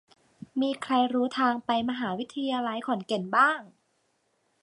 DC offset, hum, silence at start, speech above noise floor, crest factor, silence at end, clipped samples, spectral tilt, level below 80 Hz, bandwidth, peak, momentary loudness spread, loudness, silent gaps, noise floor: under 0.1%; none; 0.55 s; 45 dB; 20 dB; 0.95 s; under 0.1%; -5 dB/octave; -74 dBFS; 11 kHz; -10 dBFS; 9 LU; -27 LUFS; none; -73 dBFS